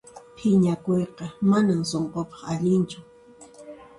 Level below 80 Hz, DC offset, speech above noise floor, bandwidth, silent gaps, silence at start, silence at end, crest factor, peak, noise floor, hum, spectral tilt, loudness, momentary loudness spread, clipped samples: -58 dBFS; under 0.1%; 26 dB; 11.5 kHz; none; 0.15 s; 0.15 s; 14 dB; -10 dBFS; -49 dBFS; none; -7 dB/octave; -24 LUFS; 12 LU; under 0.1%